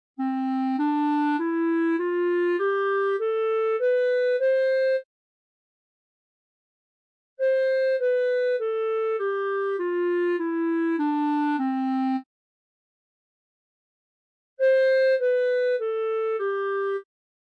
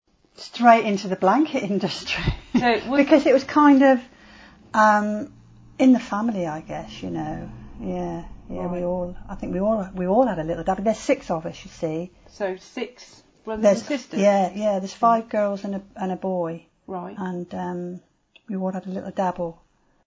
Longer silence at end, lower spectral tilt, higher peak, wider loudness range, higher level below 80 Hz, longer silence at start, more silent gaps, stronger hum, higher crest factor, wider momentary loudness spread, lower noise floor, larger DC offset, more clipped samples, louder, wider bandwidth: second, 0.4 s vs 0.55 s; about the same, -5 dB/octave vs -6 dB/octave; second, -16 dBFS vs -2 dBFS; second, 5 LU vs 11 LU; second, under -90 dBFS vs -46 dBFS; second, 0.2 s vs 0.4 s; first, 5.05-7.37 s, 12.26-14.57 s vs none; neither; second, 10 dB vs 20 dB; second, 5 LU vs 17 LU; first, under -90 dBFS vs -48 dBFS; neither; neither; about the same, -24 LUFS vs -22 LUFS; second, 5 kHz vs 7.8 kHz